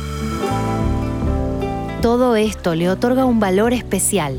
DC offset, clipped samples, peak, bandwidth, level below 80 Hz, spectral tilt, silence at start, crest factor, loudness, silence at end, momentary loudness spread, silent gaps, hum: under 0.1%; under 0.1%; -4 dBFS; 17.5 kHz; -30 dBFS; -5.5 dB/octave; 0 s; 14 dB; -18 LUFS; 0 s; 7 LU; none; none